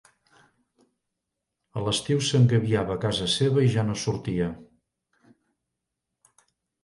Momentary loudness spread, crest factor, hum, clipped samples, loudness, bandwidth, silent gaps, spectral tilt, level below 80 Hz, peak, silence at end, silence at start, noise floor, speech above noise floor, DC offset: 11 LU; 20 dB; none; under 0.1%; -24 LUFS; 11.5 kHz; none; -5.5 dB/octave; -54 dBFS; -8 dBFS; 2.2 s; 1.75 s; -84 dBFS; 60 dB; under 0.1%